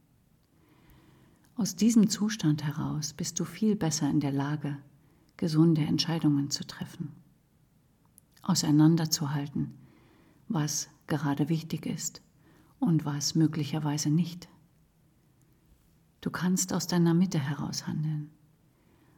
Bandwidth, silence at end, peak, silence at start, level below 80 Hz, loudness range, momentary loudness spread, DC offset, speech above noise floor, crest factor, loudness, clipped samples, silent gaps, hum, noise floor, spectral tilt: 18 kHz; 0.9 s; -12 dBFS; 1.6 s; -66 dBFS; 4 LU; 13 LU; under 0.1%; 37 dB; 18 dB; -29 LUFS; under 0.1%; none; none; -65 dBFS; -5 dB/octave